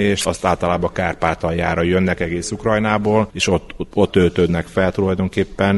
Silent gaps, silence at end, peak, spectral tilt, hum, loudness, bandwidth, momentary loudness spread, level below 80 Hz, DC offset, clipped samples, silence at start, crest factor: none; 0 s; 0 dBFS; -5.5 dB/octave; none; -18 LUFS; 11.5 kHz; 5 LU; -38 dBFS; under 0.1%; under 0.1%; 0 s; 18 dB